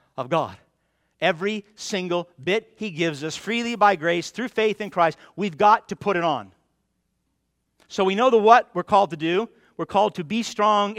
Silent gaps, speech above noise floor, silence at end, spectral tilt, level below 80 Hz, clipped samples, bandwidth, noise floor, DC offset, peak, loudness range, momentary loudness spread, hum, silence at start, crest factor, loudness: none; 52 dB; 0 s; -4.5 dB/octave; -66 dBFS; under 0.1%; 14.5 kHz; -74 dBFS; under 0.1%; -2 dBFS; 5 LU; 12 LU; none; 0.15 s; 22 dB; -22 LUFS